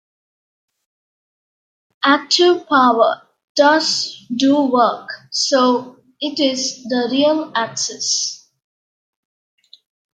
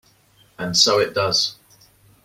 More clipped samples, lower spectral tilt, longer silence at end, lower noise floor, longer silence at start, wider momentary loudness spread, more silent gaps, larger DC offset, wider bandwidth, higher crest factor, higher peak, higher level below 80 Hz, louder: neither; about the same, -2 dB/octave vs -2 dB/octave; first, 1.8 s vs 0.7 s; first, under -90 dBFS vs -56 dBFS; first, 2 s vs 0.6 s; about the same, 11 LU vs 9 LU; first, 3.44-3.55 s vs none; neither; second, 9.4 kHz vs 16.5 kHz; about the same, 18 dB vs 22 dB; about the same, 0 dBFS vs -2 dBFS; second, -72 dBFS vs -58 dBFS; about the same, -16 LUFS vs -18 LUFS